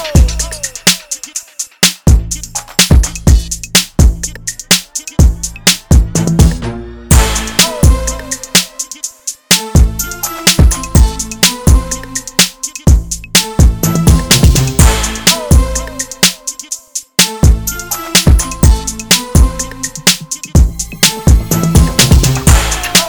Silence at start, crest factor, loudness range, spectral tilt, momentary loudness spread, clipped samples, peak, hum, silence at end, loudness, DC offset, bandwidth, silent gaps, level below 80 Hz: 0 s; 10 dB; 2 LU; -3.5 dB/octave; 11 LU; 0.6%; 0 dBFS; none; 0 s; -11 LUFS; under 0.1%; over 20 kHz; none; -14 dBFS